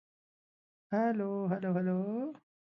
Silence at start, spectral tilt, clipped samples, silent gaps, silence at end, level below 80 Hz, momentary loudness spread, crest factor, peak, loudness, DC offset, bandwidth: 0.9 s; -9 dB/octave; under 0.1%; none; 0.45 s; -84 dBFS; 6 LU; 16 dB; -18 dBFS; -34 LUFS; under 0.1%; 5.8 kHz